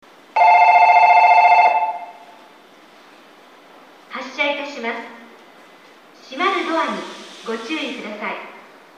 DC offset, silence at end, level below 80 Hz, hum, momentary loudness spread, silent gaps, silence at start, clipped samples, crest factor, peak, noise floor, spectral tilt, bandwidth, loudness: under 0.1%; 0.45 s; -82 dBFS; none; 22 LU; none; 0.35 s; under 0.1%; 18 dB; 0 dBFS; -47 dBFS; -3 dB/octave; 9.4 kHz; -15 LUFS